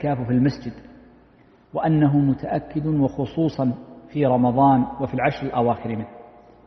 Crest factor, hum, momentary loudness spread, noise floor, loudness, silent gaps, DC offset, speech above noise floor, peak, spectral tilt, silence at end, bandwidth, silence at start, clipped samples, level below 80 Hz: 16 dB; none; 14 LU; -53 dBFS; -22 LUFS; none; under 0.1%; 33 dB; -6 dBFS; -9.5 dB/octave; 0.45 s; 6.2 kHz; 0 s; under 0.1%; -50 dBFS